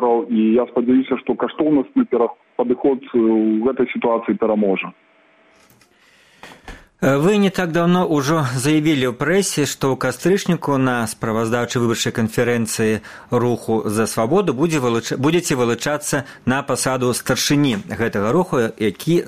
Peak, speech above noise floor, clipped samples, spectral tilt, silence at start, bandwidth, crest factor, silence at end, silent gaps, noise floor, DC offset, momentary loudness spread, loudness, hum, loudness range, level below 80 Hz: -2 dBFS; 36 dB; under 0.1%; -5 dB/octave; 0 s; 15.5 kHz; 16 dB; 0 s; none; -53 dBFS; under 0.1%; 5 LU; -18 LUFS; none; 3 LU; -52 dBFS